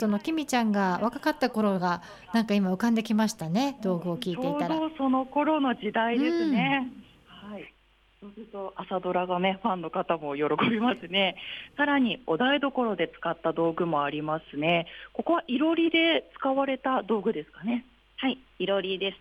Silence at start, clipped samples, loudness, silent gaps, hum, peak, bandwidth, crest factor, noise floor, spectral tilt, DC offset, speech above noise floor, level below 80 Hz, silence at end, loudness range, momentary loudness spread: 0 s; under 0.1%; -27 LUFS; none; none; -12 dBFS; 14.5 kHz; 16 dB; -63 dBFS; -5.5 dB/octave; under 0.1%; 36 dB; -64 dBFS; 0.05 s; 4 LU; 9 LU